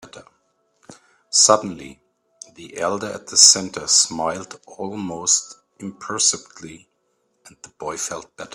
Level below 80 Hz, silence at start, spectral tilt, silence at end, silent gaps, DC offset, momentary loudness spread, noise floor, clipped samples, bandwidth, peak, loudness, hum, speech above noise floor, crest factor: -64 dBFS; 0.05 s; -0.5 dB/octave; 0 s; none; under 0.1%; 26 LU; -69 dBFS; under 0.1%; 15.5 kHz; 0 dBFS; -17 LUFS; none; 48 dB; 22 dB